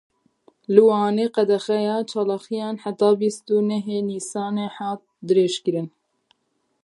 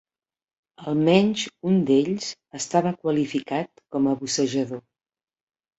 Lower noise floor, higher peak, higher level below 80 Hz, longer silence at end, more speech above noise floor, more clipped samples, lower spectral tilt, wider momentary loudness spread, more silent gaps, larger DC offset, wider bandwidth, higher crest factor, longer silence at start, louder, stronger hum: second, -71 dBFS vs under -90 dBFS; about the same, -2 dBFS vs -4 dBFS; second, -76 dBFS vs -66 dBFS; about the same, 0.95 s vs 1 s; second, 51 dB vs over 67 dB; neither; about the same, -5.5 dB/octave vs -5.5 dB/octave; about the same, 12 LU vs 12 LU; neither; neither; first, 11.5 kHz vs 8.2 kHz; about the same, 20 dB vs 22 dB; about the same, 0.7 s vs 0.8 s; about the same, -22 LUFS vs -23 LUFS; neither